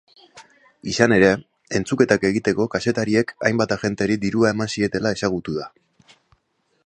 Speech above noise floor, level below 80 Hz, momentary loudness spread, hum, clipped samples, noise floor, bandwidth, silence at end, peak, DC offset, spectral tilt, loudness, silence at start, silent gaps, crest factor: 48 dB; -52 dBFS; 10 LU; none; under 0.1%; -68 dBFS; 9.8 kHz; 1.15 s; 0 dBFS; under 0.1%; -5.5 dB/octave; -20 LUFS; 0.35 s; none; 20 dB